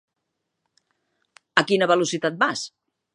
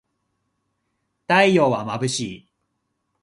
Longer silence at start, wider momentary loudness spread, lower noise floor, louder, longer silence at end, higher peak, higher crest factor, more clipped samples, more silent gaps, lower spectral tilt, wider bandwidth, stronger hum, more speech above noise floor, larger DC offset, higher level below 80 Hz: first, 1.55 s vs 1.3 s; about the same, 9 LU vs 11 LU; first, -79 dBFS vs -75 dBFS; second, -22 LUFS vs -19 LUFS; second, 0.45 s vs 0.85 s; about the same, 0 dBFS vs -2 dBFS; about the same, 24 dB vs 22 dB; neither; neither; about the same, -3.5 dB/octave vs -4.5 dB/octave; about the same, 11.5 kHz vs 11.5 kHz; neither; about the same, 58 dB vs 56 dB; neither; second, -72 dBFS vs -62 dBFS